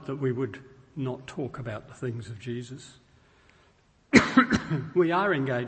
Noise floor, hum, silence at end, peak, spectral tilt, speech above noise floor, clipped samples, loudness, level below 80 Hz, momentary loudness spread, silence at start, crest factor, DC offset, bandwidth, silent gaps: -62 dBFS; none; 0 s; -2 dBFS; -6 dB/octave; 36 dB; under 0.1%; -27 LUFS; -54 dBFS; 17 LU; 0 s; 26 dB; under 0.1%; 8.8 kHz; none